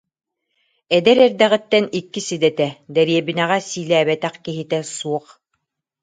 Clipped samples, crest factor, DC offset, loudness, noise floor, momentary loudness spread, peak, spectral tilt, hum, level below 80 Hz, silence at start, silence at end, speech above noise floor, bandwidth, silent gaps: under 0.1%; 18 dB; under 0.1%; -18 LUFS; -74 dBFS; 12 LU; 0 dBFS; -4.5 dB/octave; none; -66 dBFS; 0.9 s; 0.85 s; 56 dB; 9.4 kHz; none